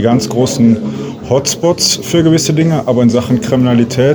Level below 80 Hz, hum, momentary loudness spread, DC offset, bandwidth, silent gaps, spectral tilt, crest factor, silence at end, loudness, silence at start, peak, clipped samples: -42 dBFS; none; 4 LU; under 0.1%; over 20 kHz; none; -5 dB/octave; 10 dB; 0 s; -11 LUFS; 0 s; 0 dBFS; under 0.1%